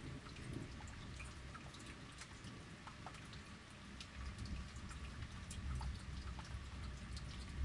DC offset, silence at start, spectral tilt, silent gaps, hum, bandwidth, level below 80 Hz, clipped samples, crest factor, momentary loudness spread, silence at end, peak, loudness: under 0.1%; 0 s; -4.5 dB/octave; none; none; 11.5 kHz; -54 dBFS; under 0.1%; 18 dB; 6 LU; 0 s; -32 dBFS; -51 LUFS